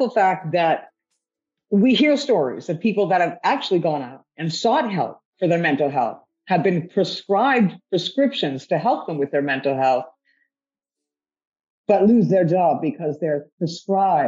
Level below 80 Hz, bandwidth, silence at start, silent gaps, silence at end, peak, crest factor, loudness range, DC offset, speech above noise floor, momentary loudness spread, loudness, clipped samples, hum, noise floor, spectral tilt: -70 dBFS; 7.8 kHz; 0 s; 5.25-5.33 s, 11.47-11.52 s, 11.70-11.84 s, 13.52-13.58 s; 0 s; -4 dBFS; 16 dB; 3 LU; under 0.1%; over 70 dB; 9 LU; -20 LUFS; under 0.1%; none; under -90 dBFS; -6.5 dB/octave